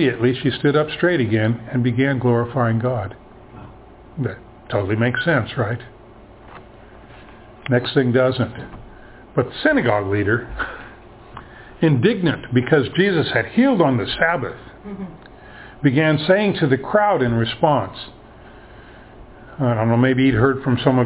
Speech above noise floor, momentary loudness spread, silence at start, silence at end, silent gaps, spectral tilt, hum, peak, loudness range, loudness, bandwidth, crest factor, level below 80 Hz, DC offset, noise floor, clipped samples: 25 dB; 19 LU; 0 s; 0 s; none; -11 dB/octave; none; -2 dBFS; 5 LU; -19 LUFS; 4 kHz; 18 dB; -46 dBFS; under 0.1%; -43 dBFS; under 0.1%